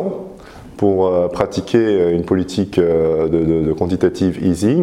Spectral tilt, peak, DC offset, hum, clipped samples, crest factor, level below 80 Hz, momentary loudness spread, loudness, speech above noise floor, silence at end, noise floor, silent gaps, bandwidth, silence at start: -7.5 dB/octave; 0 dBFS; under 0.1%; none; under 0.1%; 16 dB; -40 dBFS; 5 LU; -16 LUFS; 21 dB; 0 s; -36 dBFS; none; 13 kHz; 0 s